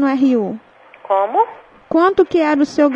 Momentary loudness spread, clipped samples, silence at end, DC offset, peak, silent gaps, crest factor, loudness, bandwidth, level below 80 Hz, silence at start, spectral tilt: 7 LU; under 0.1%; 0 s; under 0.1%; -2 dBFS; none; 14 dB; -16 LUFS; 8.2 kHz; -56 dBFS; 0 s; -6 dB/octave